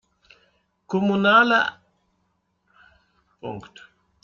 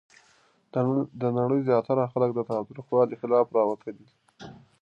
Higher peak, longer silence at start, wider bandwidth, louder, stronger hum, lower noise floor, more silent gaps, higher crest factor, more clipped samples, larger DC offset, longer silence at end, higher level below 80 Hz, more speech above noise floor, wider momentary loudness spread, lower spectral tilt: first, -6 dBFS vs -10 dBFS; first, 0.9 s vs 0.75 s; about the same, 7.2 kHz vs 6.8 kHz; first, -19 LUFS vs -26 LUFS; neither; first, -71 dBFS vs -63 dBFS; neither; about the same, 20 dB vs 18 dB; neither; neither; first, 0.65 s vs 0.3 s; about the same, -66 dBFS vs -70 dBFS; first, 51 dB vs 38 dB; first, 22 LU vs 15 LU; second, -6 dB/octave vs -9.5 dB/octave